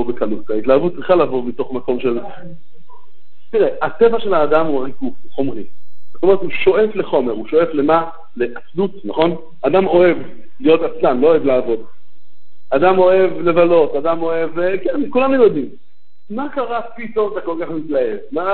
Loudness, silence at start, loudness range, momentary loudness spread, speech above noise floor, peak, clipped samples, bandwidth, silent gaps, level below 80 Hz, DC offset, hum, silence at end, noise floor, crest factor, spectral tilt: -17 LUFS; 0 s; 4 LU; 11 LU; 50 dB; 0 dBFS; under 0.1%; 4.4 kHz; none; -52 dBFS; 8%; none; 0 s; -66 dBFS; 16 dB; -10.5 dB/octave